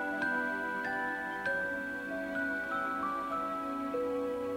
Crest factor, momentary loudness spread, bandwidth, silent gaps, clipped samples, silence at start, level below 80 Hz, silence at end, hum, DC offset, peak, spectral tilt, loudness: 12 dB; 4 LU; 16 kHz; none; under 0.1%; 0 s; -66 dBFS; 0 s; none; under 0.1%; -22 dBFS; -5 dB/octave; -34 LUFS